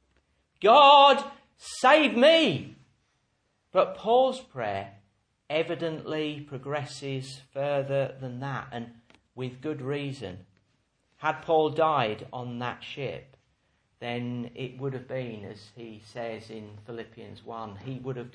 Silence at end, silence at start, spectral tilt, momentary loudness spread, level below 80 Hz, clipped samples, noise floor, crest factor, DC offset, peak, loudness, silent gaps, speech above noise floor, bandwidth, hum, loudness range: 0.05 s; 0.6 s; -5 dB/octave; 23 LU; -68 dBFS; under 0.1%; -73 dBFS; 24 dB; under 0.1%; -4 dBFS; -25 LUFS; none; 47 dB; 10.5 kHz; none; 16 LU